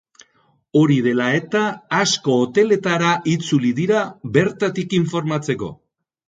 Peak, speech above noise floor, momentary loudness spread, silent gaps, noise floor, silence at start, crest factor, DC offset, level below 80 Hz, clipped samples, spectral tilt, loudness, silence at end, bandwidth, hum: 0 dBFS; 43 dB; 6 LU; none; -61 dBFS; 0.75 s; 18 dB; under 0.1%; -60 dBFS; under 0.1%; -5.5 dB/octave; -19 LUFS; 0.55 s; 9.4 kHz; none